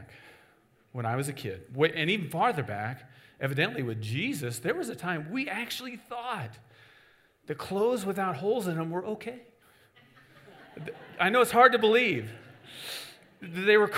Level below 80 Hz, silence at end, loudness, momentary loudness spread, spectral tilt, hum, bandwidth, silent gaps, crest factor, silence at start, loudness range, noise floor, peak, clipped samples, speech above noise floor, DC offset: -72 dBFS; 0 s; -28 LUFS; 20 LU; -5 dB/octave; none; 16 kHz; none; 24 dB; 0 s; 8 LU; -64 dBFS; -6 dBFS; under 0.1%; 35 dB; under 0.1%